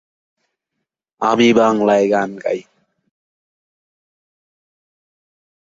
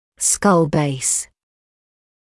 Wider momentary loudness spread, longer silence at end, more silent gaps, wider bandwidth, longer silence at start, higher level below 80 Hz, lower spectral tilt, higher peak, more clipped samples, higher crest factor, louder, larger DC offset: first, 11 LU vs 7 LU; first, 3.15 s vs 1 s; neither; second, 7.8 kHz vs 12 kHz; first, 1.2 s vs 0.2 s; second, -62 dBFS vs -52 dBFS; about the same, -5 dB/octave vs -4 dB/octave; about the same, -2 dBFS vs -4 dBFS; neither; about the same, 18 dB vs 16 dB; about the same, -15 LUFS vs -17 LUFS; neither